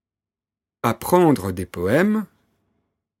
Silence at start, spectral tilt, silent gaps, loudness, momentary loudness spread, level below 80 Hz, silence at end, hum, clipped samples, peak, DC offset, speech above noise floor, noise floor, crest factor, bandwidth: 0.85 s; -6.5 dB/octave; none; -20 LUFS; 10 LU; -54 dBFS; 0.95 s; none; under 0.1%; -2 dBFS; under 0.1%; over 71 dB; under -90 dBFS; 20 dB; 17 kHz